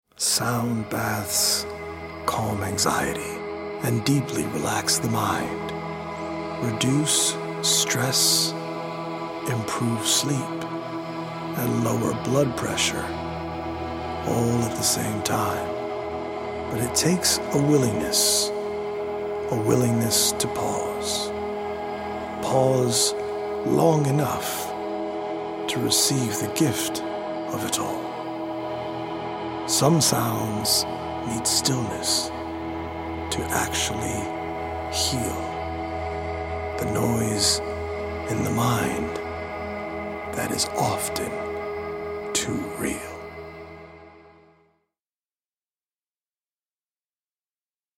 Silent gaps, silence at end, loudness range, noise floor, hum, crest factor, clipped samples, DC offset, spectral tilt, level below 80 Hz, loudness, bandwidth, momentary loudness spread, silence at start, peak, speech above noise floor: none; 3.65 s; 5 LU; under -90 dBFS; none; 20 dB; under 0.1%; under 0.1%; -3.5 dB/octave; -48 dBFS; -24 LUFS; 16.5 kHz; 11 LU; 0.2 s; -6 dBFS; over 67 dB